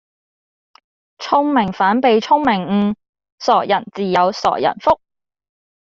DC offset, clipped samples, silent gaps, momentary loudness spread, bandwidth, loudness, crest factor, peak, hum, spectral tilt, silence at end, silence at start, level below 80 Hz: under 0.1%; under 0.1%; 3.09-3.13 s, 3.32-3.38 s; 7 LU; 7.6 kHz; -16 LUFS; 16 dB; -2 dBFS; none; -6 dB/octave; 0.95 s; 1.2 s; -54 dBFS